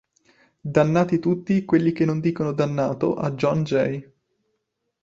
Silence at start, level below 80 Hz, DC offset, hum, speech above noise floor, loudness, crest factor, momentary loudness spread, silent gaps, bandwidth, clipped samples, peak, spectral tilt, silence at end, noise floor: 0.65 s; -58 dBFS; under 0.1%; none; 55 dB; -22 LUFS; 20 dB; 5 LU; none; 7.6 kHz; under 0.1%; -4 dBFS; -8 dB/octave; 1 s; -76 dBFS